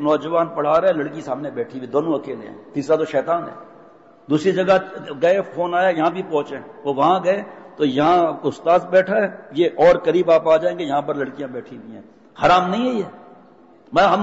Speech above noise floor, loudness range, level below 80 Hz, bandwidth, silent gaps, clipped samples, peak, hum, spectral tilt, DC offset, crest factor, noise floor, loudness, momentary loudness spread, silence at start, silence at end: 30 dB; 5 LU; -56 dBFS; 8 kHz; none; under 0.1%; -4 dBFS; none; -6.5 dB/octave; under 0.1%; 14 dB; -48 dBFS; -19 LUFS; 14 LU; 0 s; 0 s